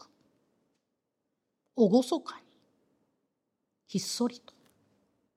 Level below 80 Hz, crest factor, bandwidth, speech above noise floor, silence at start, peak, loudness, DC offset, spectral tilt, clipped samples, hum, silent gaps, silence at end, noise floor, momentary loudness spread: -88 dBFS; 24 dB; 15.5 kHz; 55 dB; 1.75 s; -12 dBFS; -29 LUFS; under 0.1%; -5.5 dB/octave; under 0.1%; none; none; 1 s; -83 dBFS; 19 LU